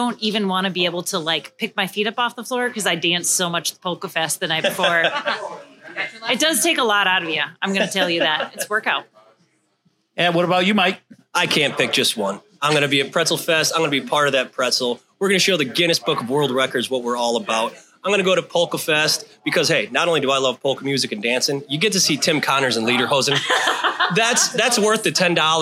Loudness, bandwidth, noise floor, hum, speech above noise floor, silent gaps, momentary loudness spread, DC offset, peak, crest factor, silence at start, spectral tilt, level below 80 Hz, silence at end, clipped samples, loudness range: -19 LUFS; 16.5 kHz; -65 dBFS; none; 45 dB; none; 7 LU; under 0.1%; -2 dBFS; 18 dB; 0 s; -2.5 dB/octave; -72 dBFS; 0 s; under 0.1%; 3 LU